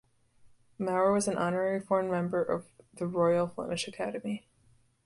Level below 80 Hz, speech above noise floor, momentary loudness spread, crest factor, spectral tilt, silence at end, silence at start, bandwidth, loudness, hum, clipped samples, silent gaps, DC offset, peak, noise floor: -68 dBFS; 35 dB; 10 LU; 16 dB; -5.5 dB/octave; 0.7 s; 0.45 s; 11.5 kHz; -31 LUFS; none; under 0.1%; none; under 0.1%; -14 dBFS; -65 dBFS